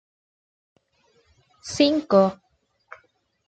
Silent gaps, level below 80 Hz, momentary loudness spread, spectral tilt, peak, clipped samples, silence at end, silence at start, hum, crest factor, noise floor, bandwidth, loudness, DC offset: none; -64 dBFS; 17 LU; -5 dB/octave; -6 dBFS; under 0.1%; 1.15 s; 1.65 s; none; 20 dB; -64 dBFS; 9 kHz; -21 LUFS; under 0.1%